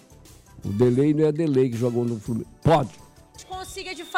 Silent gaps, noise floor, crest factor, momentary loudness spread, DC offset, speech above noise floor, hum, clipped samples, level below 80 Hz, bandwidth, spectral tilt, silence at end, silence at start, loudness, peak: none; -49 dBFS; 14 dB; 15 LU; under 0.1%; 27 dB; none; under 0.1%; -50 dBFS; 15.5 kHz; -7.5 dB/octave; 0 s; 0.55 s; -23 LUFS; -10 dBFS